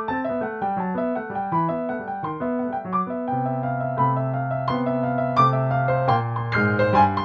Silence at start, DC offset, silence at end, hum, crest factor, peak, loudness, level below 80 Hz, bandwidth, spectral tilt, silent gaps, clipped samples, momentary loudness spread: 0 s; under 0.1%; 0 s; none; 18 dB; -4 dBFS; -23 LUFS; -54 dBFS; 6.4 kHz; -9 dB/octave; none; under 0.1%; 8 LU